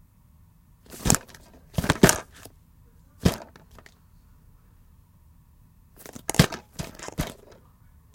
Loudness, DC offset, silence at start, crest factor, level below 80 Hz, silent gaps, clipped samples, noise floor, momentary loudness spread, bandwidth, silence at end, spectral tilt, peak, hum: -25 LUFS; under 0.1%; 0.9 s; 30 dB; -44 dBFS; none; under 0.1%; -56 dBFS; 27 LU; 17 kHz; 0.8 s; -4 dB/octave; 0 dBFS; none